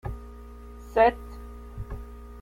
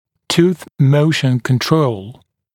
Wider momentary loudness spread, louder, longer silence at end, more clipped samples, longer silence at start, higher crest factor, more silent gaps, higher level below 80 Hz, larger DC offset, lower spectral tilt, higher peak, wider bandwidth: first, 23 LU vs 6 LU; second, -23 LUFS vs -15 LUFS; second, 0 s vs 0.4 s; neither; second, 0.05 s vs 0.3 s; first, 22 dB vs 16 dB; neither; first, -42 dBFS vs -54 dBFS; neither; about the same, -7 dB/octave vs -6 dB/octave; second, -8 dBFS vs 0 dBFS; about the same, 16 kHz vs 16.5 kHz